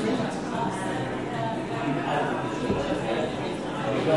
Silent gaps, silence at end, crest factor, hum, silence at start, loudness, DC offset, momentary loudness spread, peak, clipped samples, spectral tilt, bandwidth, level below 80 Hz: none; 0 s; 18 dB; none; 0 s; -28 LUFS; 0.2%; 3 LU; -10 dBFS; under 0.1%; -6 dB/octave; 11.5 kHz; -52 dBFS